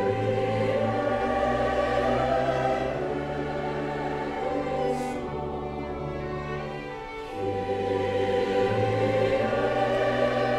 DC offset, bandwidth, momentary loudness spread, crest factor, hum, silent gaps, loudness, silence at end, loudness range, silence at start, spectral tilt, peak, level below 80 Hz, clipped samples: under 0.1%; 12 kHz; 8 LU; 16 dB; none; none; -27 LUFS; 0 s; 6 LU; 0 s; -6.5 dB/octave; -10 dBFS; -46 dBFS; under 0.1%